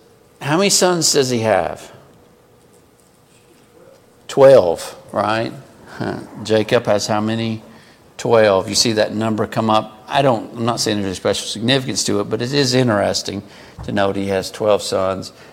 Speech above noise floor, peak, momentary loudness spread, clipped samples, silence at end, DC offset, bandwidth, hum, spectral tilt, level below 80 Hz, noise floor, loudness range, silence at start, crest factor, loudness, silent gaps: 34 dB; 0 dBFS; 13 LU; under 0.1%; 0.1 s; under 0.1%; 16.5 kHz; none; -4 dB/octave; -52 dBFS; -51 dBFS; 3 LU; 0.4 s; 18 dB; -17 LUFS; none